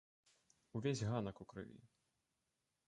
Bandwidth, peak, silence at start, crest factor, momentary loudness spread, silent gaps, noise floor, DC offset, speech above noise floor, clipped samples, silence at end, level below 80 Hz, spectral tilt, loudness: 11 kHz; -26 dBFS; 0.75 s; 20 dB; 14 LU; none; -88 dBFS; under 0.1%; 45 dB; under 0.1%; 1 s; -72 dBFS; -6 dB/octave; -44 LUFS